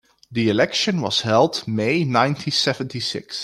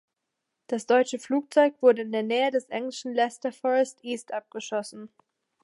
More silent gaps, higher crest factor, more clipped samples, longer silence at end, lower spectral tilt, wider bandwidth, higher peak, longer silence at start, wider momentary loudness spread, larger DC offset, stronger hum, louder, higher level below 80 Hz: neither; about the same, 18 dB vs 20 dB; neither; second, 0 s vs 0.55 s; about the same, -4.5 dB/octave vs -3.5 dB/octave; first, 14.5 kHz vs 11.5 kHz; first, -2 dBFS vs -8 dBFS; second, 0.3 s vs 0.7 s; second, 7 LU vs 12 LU; neither; neither; first, -20 LUFS vs -26 LUFS; first, -60 dBFS vs -84 dBFS